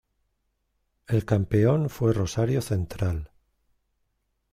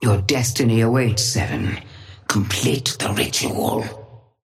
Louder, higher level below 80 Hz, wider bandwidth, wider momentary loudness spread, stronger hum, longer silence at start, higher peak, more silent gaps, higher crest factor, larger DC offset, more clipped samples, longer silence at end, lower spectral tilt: second, -25 LUFS vs -20 LUFS; about the same, -48 dBFS vs -46 dBFS; about the same, 15 kHz vs 16 kHz; second, 8 LU vs 14 LU; neither; first, 1.1 s vs 0 s; second, -8 dBFS vs -4 dBFS; neither; about the same, 18 dB vs 18 dB; neither; neither; first, 1.25 s vs 0.25 s; first, -7.5 dB/octave vs -4.5 dB/octave